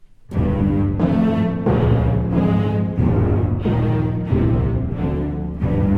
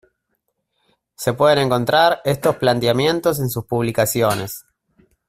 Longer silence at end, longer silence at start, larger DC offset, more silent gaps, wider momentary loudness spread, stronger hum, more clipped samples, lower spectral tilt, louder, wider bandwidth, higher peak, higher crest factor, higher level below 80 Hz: second, 0 s vs 0.7 s; second, 0.3 s vs 1.2 s; neither; neither; second, 5 LU vs 9 LU; neither; neither; first, -10.5 dB/octave vs -5 dB/octave; about the same, -19 LUFS vs -18 LUFS; second, 4.7 kHz vs 16 kHz; second, -6 dBFS vs -2 dBFS; second, 12 dB vs 18 dB; first, -28 dBFS vs -52 dBFS